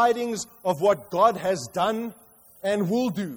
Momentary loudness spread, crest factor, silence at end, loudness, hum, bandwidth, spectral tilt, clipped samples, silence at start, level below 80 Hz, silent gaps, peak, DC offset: 9 LU; 18 dB; 0 s; -25 LUFS; none; over 20 kHz; -5 dB/octave; under 0.1%; 0 s; -64 dBFS; none; -8 dBFS; under 0.1%